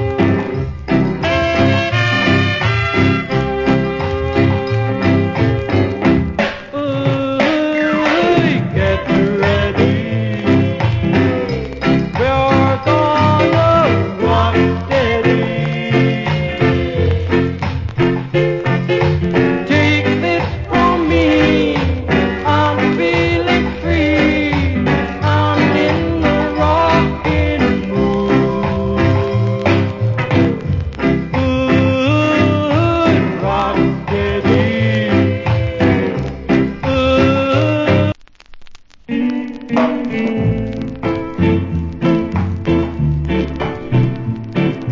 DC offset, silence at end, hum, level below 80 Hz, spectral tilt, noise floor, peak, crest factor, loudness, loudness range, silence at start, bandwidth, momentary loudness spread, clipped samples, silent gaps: under 0.1%; 0 s; none; -28 dBFS; -7.5 dB/octave; -37 dBFS; 0 dBFS; 14 dB; -15 LUFS; 4 LU; 0 s; 7.6 kHz; 6 LU; under 0.1%; none